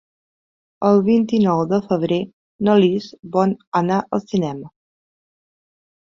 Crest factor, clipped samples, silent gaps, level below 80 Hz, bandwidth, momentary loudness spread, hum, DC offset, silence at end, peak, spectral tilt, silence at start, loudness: 18 dB; under 0.1%; 2.33-2.59 s, 3.67-3.72 s; -60 dBFS; 7.4 kHz; 8 LU; none; under 0.1%; 1.45 s; -2 dBFS; -8 dB/octave; 0.8 s; -19 LUFS